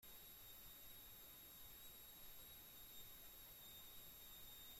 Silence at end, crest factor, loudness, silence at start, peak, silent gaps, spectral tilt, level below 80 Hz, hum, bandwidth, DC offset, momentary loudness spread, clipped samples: 0 s; 14 dB; -58 LUFS; 0 s; -46 dBFS; none; -1.5 dB/octave; -72 dBFS; none; 16.5 kHz; under 0.1%; 1 LU; under 0.1%